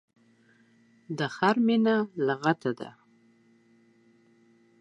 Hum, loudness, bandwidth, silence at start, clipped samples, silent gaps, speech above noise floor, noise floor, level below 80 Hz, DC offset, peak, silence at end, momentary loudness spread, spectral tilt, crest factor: none; -27 LUFS; 8.2 kHz; 1.1 s; under 0.1%; none; 36 dB; -62 dBFS; -82 dBFS; under 0.1%; -10 dBFS; 1.9 s; 16 LU; -6.5 dB/octave; 22 dB